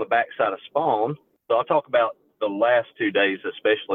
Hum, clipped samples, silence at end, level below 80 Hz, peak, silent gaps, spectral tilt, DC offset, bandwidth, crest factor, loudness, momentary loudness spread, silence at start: none; under 0.1%; 0 s; -76 dBFS; -6 dBFS; none; -8 dB/octave; under 0.1%; 4.1 kHz; 16 dB; -23 LUFS; 7 LU; 0 s